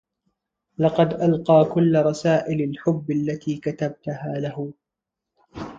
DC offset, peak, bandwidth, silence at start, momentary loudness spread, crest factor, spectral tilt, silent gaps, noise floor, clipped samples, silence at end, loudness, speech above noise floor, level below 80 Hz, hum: under 0.1%; -4 dBFS; 7.8 kHz; 0.8 s; 14 LU; 18 dB; -8 dB/octave; none; -85 dBFS; under 0.1%; 0 s; -22 LUFS; 64 dB; -58 dBFS; none